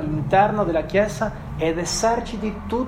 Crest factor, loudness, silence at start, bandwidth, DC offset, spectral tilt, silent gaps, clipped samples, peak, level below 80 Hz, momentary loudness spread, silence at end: 16 dB; -22 LUFS; 0 s; 16 kHz; under 0.1%; -5 dB/octave; none; under 0.1%; -4 dBFS; -38 dBFS; 9 LU; 0 s